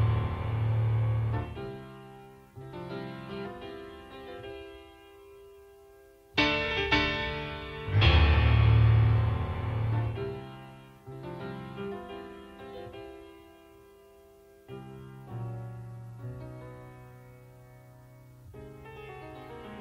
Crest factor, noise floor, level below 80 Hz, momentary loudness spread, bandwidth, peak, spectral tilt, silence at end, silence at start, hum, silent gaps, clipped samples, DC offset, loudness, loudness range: 22 dB; -56 dBFS; -38 dBFS; 25 LU; 6.6 kHz; -10 dBFS; -7 dB/octave; 0 s; 0 s; none; none; under 0.1%; under 0.1%; -28 LUFS; 21 LU